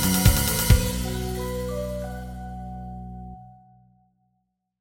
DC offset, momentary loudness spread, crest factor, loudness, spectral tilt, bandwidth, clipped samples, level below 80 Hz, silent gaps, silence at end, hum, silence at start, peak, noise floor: under 0.1%; 20 LU; 22 dB; -24 LUFS; -4.5 dB/octave; 17 kHz; under 0.1%; -30 dBFS; none; 1.25 s; none; 0 s; -4 dBFS; -75 dBFS